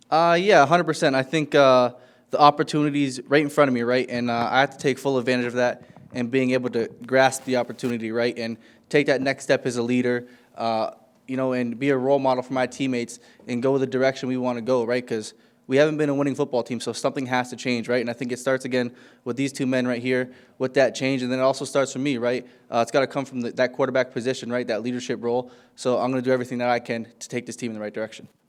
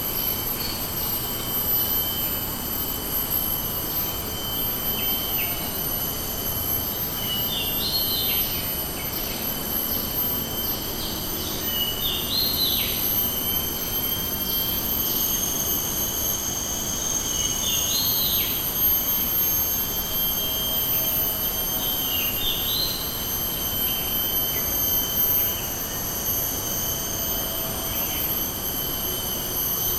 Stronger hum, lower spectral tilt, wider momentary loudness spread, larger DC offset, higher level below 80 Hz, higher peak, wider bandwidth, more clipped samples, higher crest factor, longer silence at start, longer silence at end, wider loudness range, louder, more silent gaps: neither; first, -5 dB/octave vs -2 dB/octave; first, 12 LU vs 6 LU; neither; second, -74 dBFS vs -40 dBFS; first, 0 dBFS vs -10 dBFS; second, 14 kHz vs 19 kHz; neither; first, 22 dB vs 14 dB; about the same, 0.1 s vs 0 s; first, 0.25 s vs 0 s; about the same, 5 LU vs 3 LU; about the same, -23 LUFS vs -22 LUFS; neither